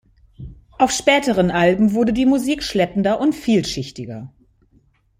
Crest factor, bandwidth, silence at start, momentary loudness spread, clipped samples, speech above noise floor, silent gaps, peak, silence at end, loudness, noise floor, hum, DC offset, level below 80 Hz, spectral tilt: 18 dB; 15.5 kHz; 0.4 s; 15 LU; under 0.1%; 40 dB; none; -2 dBFS; 0.95 s; -18 LUFS; -58 dBFS; none; under 0.1%; -46 dBFS; -5 dB/octave